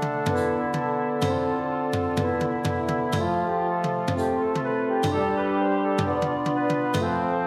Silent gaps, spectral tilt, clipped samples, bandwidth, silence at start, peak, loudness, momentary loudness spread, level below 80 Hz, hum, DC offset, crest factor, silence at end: none; -6.5 dB/octave; under 0.1%; 14.5 kHz; 0 s; -10 dBFS; -25 LUFS; 2 LU; -54 dBFS; none; under 0.1%; 14 dB; 0 s